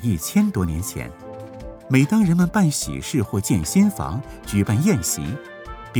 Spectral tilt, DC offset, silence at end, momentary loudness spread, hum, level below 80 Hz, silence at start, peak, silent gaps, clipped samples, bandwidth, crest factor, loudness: -5.5 dB/octave; under 0.1%; 0 s; 19 LU; none; -42 dBFS; 0 s; -2 dBFS; none; under 0.1%; over 20 kHz; 18 dB; -21 LUFS